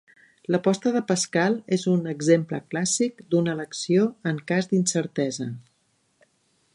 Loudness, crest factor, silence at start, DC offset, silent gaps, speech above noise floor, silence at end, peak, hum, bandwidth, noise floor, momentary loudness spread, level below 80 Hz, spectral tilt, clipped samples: -24 LUFS; 18 dB; 0.5 s; under 0.1%; none; 45 dB; 1.15 s; -6 dBFS; none; 11.5 kHz; -69 dBFS; 8 LU; -72 dBFS; -5 dB/octave; under 0.1%